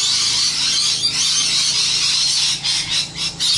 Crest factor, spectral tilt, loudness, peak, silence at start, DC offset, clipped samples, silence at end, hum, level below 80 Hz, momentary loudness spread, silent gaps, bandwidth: 12 dB; 1 dB/octave; -15 LUFS; -6 dBFS; 0 s; under 0.1%; under 0.1%; 0 s; none; -50 dBFS; 4 LU; none; 11.5 kHz